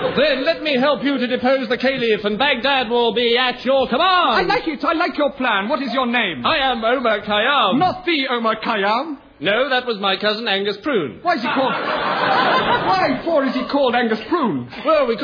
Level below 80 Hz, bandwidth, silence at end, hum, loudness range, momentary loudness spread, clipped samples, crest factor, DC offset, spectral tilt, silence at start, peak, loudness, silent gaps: -50 dBFS; 5.4 kHz; 0 s; none; 2 LU; 5 LU; under 0.1%; 14 dB; under 0.1%; -6 dB/octave; 0 s; -4 dBFS; -18 LUFS; none